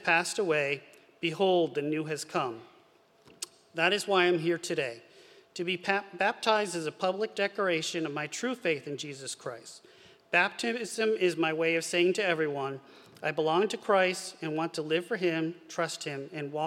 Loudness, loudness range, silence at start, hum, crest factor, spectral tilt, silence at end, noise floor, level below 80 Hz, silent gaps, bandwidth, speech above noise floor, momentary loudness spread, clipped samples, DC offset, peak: -30 LUFS; 3 LU; 0 s; none; 20 dB; -4 dB/octave; 0 s; -62 dBFS; -86 dBFS; none; 15.5 kHz; 32 dB; 12 LU; under 0.1%; under 0.1%; -10 dBFS